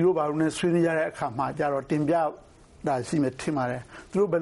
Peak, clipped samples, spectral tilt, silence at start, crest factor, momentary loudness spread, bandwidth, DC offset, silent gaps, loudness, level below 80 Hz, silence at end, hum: -14 dBFS; under 0.1%; -6.5 dB/octave; 0 s; 12 dB; 7 LU; 11.5 kHz; under 0.1%; none; -27 LUFS; -58 dBFS; 0 s; none